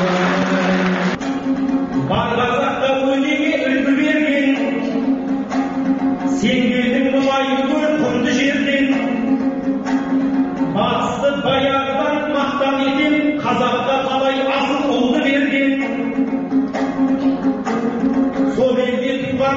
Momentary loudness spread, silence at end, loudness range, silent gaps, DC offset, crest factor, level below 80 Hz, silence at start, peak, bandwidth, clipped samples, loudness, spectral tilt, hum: 4 LU; 0 s; 1 LU; none; under 0.1%; 12 dB; -48 dBFS; 0 s; -6 dBFS; 7.6 kHz; under 0.1%; -17 LUFS; -4 dB/octave; none